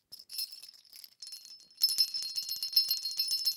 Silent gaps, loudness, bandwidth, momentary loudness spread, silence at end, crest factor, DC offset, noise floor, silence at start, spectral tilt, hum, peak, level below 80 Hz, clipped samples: none; -30 LUFS; 19 kHz; 23 LU; 0 s; 24 dB; under 0.1%; -55 dBFS; 0.1 s; 4 dB/octave; none; -12 dBFS; under -90 dBFS; under 0.1%